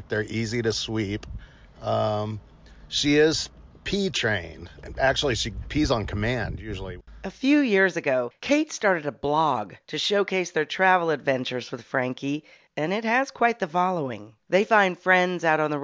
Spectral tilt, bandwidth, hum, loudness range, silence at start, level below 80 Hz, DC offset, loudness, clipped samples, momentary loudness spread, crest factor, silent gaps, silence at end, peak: -4.5 dB/octave; 8 kHz; none; 3 LU; 0 s; -44 dBFS; under 0.1%; -24 LUFS; under 0.1%; 14 LU; 20 dB; none; 0 s; -4 dBFS